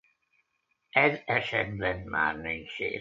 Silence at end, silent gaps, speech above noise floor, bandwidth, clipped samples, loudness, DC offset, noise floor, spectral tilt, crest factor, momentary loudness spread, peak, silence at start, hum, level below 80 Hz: 0 s; none; 48 dB; 7.6 kHz; under 0.1%; -28 LUFS; under 0.1%; -77 dBFS; -6.5 dB/octave; 22 dB; 9 LU; -8 dBFS; 0.95 s; none; -56 dBFS